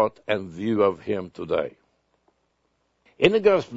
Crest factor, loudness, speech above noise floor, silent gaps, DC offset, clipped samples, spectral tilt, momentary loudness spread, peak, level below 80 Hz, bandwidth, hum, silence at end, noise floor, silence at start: 24 dB; -23 LUFS; 48 dB; none; under 0.1%; under 0.1%; -6.5 dB/octave; 11 LU; 0 dBFS; -60 dBFS; 7.8 kHz; none; 0 s; -71 dBFS; 0 s